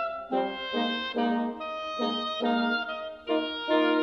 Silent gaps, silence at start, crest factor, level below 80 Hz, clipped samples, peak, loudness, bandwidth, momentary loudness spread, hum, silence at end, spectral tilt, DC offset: none; 0 s; 16 dB; -66 dBFS; under 0.1%; -12 dBFS; -29 LUFS; 6.6 kHz; 7 LU; none; 0 s; -5 dB/octave; under 0.1%